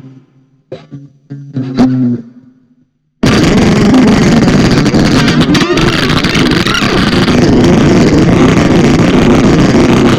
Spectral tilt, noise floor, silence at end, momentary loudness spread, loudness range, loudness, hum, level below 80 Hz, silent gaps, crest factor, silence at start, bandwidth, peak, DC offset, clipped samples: -6 dB/octave; -53 dBFS; 0 s; 6 LU; 6 LU; -8 LUFS; none; -24 dBFS; none; 8 dB; 0.05 s; 14.5 kHz; 0 dBFS; under 0.1%; under 0.1%